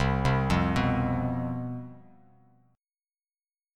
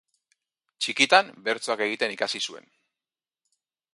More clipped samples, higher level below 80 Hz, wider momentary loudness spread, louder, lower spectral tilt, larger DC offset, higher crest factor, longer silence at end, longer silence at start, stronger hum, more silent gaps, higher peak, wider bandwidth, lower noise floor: neither; first, -40 dBFS vs -78 dBFS; about the same, 13 LU vs 12 LU; second, -28 LUFS vs -24 LUFS; first, -7 dB/octave vs -1.5 dB/octave; neither; second, 18 dB vs 26 dB; first, 1.75 s vs 1.35 s; second, 0 s vs 0.8 s; neither; neither; second, -10 dBFS vs -2 dBFS; about the same, 11 kHz vs 11.5 kHz; about the same, under -90 dBFS vs under -90 dBFS